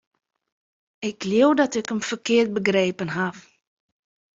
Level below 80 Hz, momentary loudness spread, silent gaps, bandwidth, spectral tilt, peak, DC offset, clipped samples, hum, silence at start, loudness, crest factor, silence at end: -66 dBFS; 11 LU; none; 7.8 kHz; -5 dB/octave; -6 dBFS; under 0.1%; under 0.1%; none; 1 s; -22 LUFS; 18 dB; 1 s